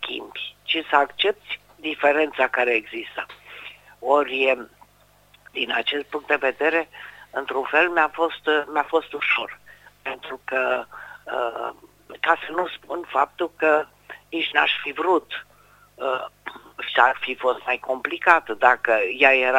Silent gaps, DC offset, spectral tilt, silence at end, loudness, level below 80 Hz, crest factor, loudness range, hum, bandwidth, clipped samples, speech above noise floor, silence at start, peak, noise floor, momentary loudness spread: none; under 0.1%; -3.5 dB/octave; 0 s; -22 LUFS; -64 dBFS; 24 dB; 4 LU; 50 Hz at -60 dBFS; 16 kHz; under 0.1%; 34 dB; 0 s; 0 dBFS; -57 dBFS; 16 LU